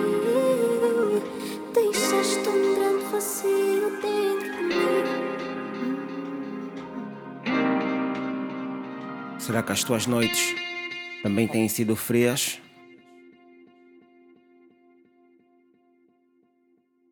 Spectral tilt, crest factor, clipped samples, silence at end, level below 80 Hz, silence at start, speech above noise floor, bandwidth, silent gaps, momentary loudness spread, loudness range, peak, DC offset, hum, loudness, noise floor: -4 dB/octave; 18 dB; under 0.1%; 3.8 s; -68 dBFS; 0 s; 42 dB; 19 kHz; none; 11 LU; 6 LU; -8 dBFS; under 0.1%; none; -25 LUFS; -66 dBFS